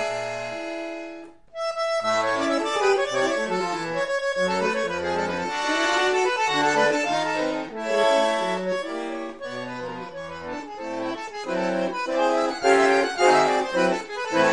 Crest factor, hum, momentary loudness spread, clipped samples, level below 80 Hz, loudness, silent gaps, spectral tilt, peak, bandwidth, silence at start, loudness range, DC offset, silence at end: 20 dB; none; 13 LU; under 0.1%; -62 dBFS; -24 LUFS; none; -3.5 dB/octave; -4 dBFS; 11.5 kHz; 0 s; 6 LU; 0.2%; 0 s